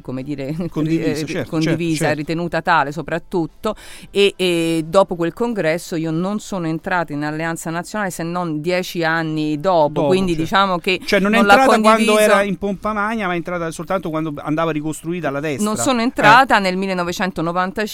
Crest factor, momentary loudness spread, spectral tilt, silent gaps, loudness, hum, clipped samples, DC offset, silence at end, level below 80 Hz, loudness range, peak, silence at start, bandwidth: 18 dB; 11 LU; -5 dB/octave; none; -18 LUFS; none; under 0.1%; under 0.1%; 0 s; -44 dBFS; 7 LU; 0 dBFS; 0.05 s; 16.5 kHz